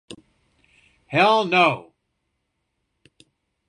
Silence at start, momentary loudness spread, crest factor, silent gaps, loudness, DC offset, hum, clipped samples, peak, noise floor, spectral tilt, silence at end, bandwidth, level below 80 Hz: 0.1 s; 9 LU; 22 dB; none; -18 LUFS; under 0.1%; none; under 0.1%; -4 dBFS; -76 dBFS; -5 dB/octave; 1.9 s; 11 kHz; -68 dBFS